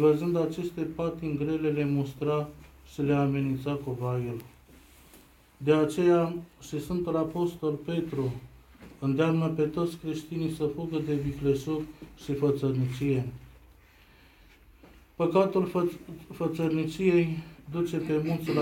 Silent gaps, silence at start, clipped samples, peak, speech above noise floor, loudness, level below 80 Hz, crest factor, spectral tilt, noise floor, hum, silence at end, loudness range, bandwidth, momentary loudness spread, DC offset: none; 0 s; under 0.1%; -10 dBFS; 29 dB; -29 LUFS; -56 dBFS; 20 dB; -8 dB/octave; -57 dBFS; none; 0 s; 3 LU; 17 kHz; 12 LU; under 0.1%